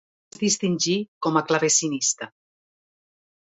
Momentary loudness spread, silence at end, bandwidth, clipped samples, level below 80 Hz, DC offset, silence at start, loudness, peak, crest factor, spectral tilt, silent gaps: 8 LU; 1.3 s; 8.2 kHz; under 0.1%; -70 dBFS; under 0.1%; 0.4 s; -22 LUFS; -6 dBFS; 20 dB; -3 dB/octave; 1.08-1.21 s